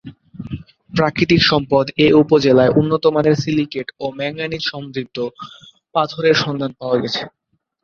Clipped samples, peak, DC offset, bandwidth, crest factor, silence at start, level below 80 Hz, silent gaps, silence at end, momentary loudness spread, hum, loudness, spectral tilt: under 0.1%; 0 dBFS; under 0.1%; 7 kHz; 16 dB; 0.05 s; -48 dBFS; none; 0.55 s; 18 LU; none; -17 LUFS; -6 dB/octave